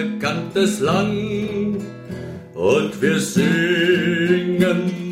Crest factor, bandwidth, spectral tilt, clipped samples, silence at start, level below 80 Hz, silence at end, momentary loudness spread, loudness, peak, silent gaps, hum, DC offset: 16 dB; 16 kHz; -5.5 dB/octave; under 0.1%; 0 s; -52 dBFS; 0 s; 12 LU; -19 LUFS; -4 dBFS; none; none; under 0.1%